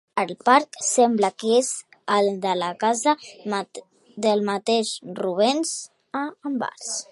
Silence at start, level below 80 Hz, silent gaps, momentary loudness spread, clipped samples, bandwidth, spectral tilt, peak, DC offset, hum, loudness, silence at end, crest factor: 0.15 s; -78 dBFS; none; 11 LU; under 0.1%; 11.5 kHz; -3 dB/octave; -2 dBFS; under 0.1%; none; -23 LUFS; 0.1 s; 20 dB